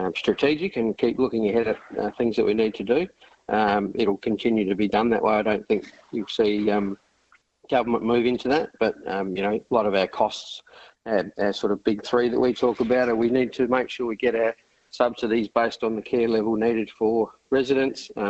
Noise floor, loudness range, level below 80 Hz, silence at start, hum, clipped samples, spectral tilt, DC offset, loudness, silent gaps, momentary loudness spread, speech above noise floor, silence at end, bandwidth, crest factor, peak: -62 dBFS; 2 LU; -58 dBFS; 0 s; none; under 0.1%; -6 dB/octave; under 0.1%; -24 LUFS; none; 7 LU; 39 dB; 0 s; 8.2 kHz; 20 dB; -4 dBFS